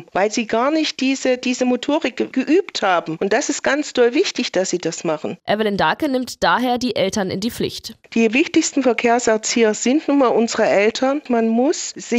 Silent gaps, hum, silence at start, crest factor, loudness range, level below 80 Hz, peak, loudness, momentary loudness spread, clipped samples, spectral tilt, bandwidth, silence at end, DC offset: none; none; 0 s; 14 dB; 3 LU; -56 dBFS; -4 dBFS; -18 LUFS; 6 LU; under 0.1%; -3.5 dB/octave; 15.5 kHz; 0 s; under 0.1%